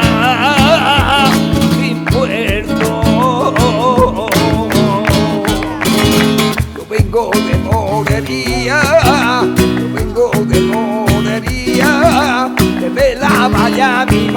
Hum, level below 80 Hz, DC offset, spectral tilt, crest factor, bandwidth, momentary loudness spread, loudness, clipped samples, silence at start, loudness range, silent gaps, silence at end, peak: none; -26 dBFS; under 0.1%; -5 dB/octave; 12 dB; 19 kHz; 6 LU; -12 LUFS; under 0.1%; 0 s; 1 LU; none; 0 s; 0 dBFS